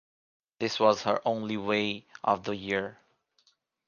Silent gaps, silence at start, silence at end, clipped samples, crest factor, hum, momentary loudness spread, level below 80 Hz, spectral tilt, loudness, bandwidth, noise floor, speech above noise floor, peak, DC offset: none; 0.6 s; 0.95 s; under 0.1%; 22 dB; none; 8 LU; -68 dBFS; -4.5 dB/octave; -29 LUFS; 7.2 kHz; -70 dBFS; 41 dB; -8 dBFS; under 0.1%